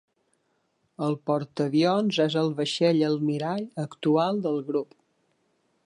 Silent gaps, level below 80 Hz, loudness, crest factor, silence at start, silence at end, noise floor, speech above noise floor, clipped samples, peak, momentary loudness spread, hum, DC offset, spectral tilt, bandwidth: none; -76 dBFS; -26 LUFS; 16 dB; 1 s; 1 s; -72 dBFS; 47 dB; under 0.1%; -10 dBFS; 8 LU; none; under 0.1%; -6.5 dB/octave; 10.5 kHz